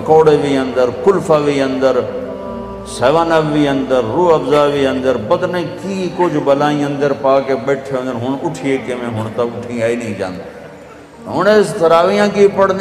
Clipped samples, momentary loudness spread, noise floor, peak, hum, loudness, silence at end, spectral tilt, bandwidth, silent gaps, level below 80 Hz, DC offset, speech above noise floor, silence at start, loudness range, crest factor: under 0.1%; 12 LU; -36 dBFS; 0 dBFS; none; -14 LUFS; 0 s; -6 dB/octave; 13.5 kHz; none; -46 dBFS; under 0.1%; 22 dB; 0 s; 5 LU; 14 dB